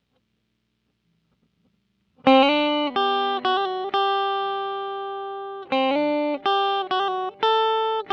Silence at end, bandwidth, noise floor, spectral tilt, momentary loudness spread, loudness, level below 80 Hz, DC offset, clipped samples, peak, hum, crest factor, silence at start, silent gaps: 0 s; 6.8 kHz; -73 dBFS; -4.5 dB/octave; 12 LU; -22 LUFS; -74 dBFS; under 0.1%; under 0.1%; -2 dBFS; 60 Hz at -75 dBFS; 22 dB; 2.25 s; none